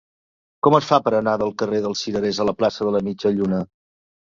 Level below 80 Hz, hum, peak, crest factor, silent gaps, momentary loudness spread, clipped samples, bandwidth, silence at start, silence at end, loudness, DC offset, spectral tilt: -56 dBFS; none; -2 dBFS; 20 dB; none; 6 LU; under 0.1%; 7.6 kHz; 0.65 s; 0.7 s; -20 LUFS; under 0.1%; -6 dB/octave